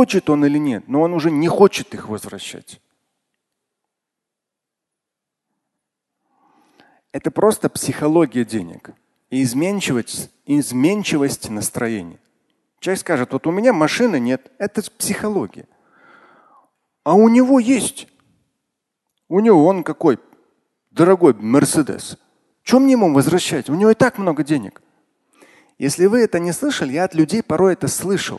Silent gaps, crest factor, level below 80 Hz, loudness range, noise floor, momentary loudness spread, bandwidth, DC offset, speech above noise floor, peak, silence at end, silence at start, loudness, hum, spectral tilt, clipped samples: none; 18 dB; -56 dBFS; 6 LU; -83 dBFS; 15 LU; 12.5 kHz; under 0.1%; 66 dB; 0 dBFS; 0 s; 0 s; -17 LUFS; none; -5.5 dB/octave; under 0.1%